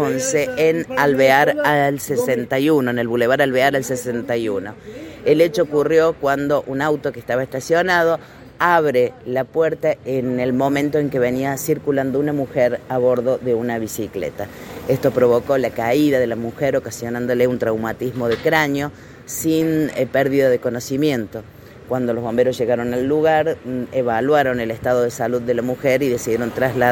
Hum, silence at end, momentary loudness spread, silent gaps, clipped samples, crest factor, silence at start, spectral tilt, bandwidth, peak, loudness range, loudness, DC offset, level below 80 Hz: none; 0 s; 8 LU; none; under 0.1%; 18 dB; 0 s; -5.5 dB/octave; 17 kHz; 0 dBFS; 3 LU; -19 LUFS; under 0.1%; -52 dBFS